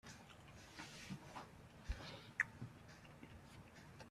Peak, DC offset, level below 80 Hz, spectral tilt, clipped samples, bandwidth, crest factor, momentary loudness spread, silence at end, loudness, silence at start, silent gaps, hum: -24 dBFS; under 0.1%; -60 dBFS; -4 dB/octave; under 0.1%; 14.5 kHz; 30 dB; 17 LU; 0 s; -52 LUFS; 0.05 s; none; none